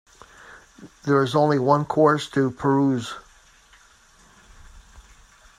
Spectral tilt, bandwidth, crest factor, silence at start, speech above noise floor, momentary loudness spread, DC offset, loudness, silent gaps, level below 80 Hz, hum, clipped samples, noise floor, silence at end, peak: -7 dB/octave; 12.5 kHz; 22 dB; 0.8 s; 34 dB; 13 LU; under 0.1%; -21 LUFS; none; -54 dBFS; none; under 0.1%; -54 dBFS; 0.6 s; -2 dBFS